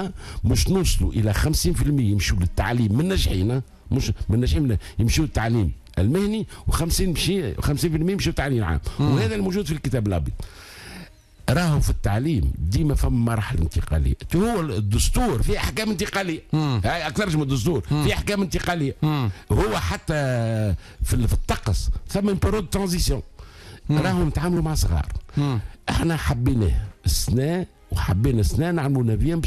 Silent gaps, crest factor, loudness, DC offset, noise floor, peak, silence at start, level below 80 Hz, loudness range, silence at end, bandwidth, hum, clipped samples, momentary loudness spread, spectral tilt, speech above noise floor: none; 12 dB; -23 LUFS; under 0.1%; -44 dBFS; -10 dBFS; 0 s; -28 dBFS; 2 LU; 0 s; 14.5 kHz; none; under 0.1%; 6 LU; -5.5 dB/octave; 22 dB